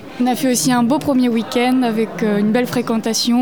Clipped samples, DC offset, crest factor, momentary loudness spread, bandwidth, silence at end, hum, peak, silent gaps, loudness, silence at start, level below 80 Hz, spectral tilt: under 0.1%; 0.6%; 12 dB; 4 LU; 20 kHz; 0 s; none; -4 dBFS; none; -17 LUFS; 0 s; -56 dBFS; -4 dB/octave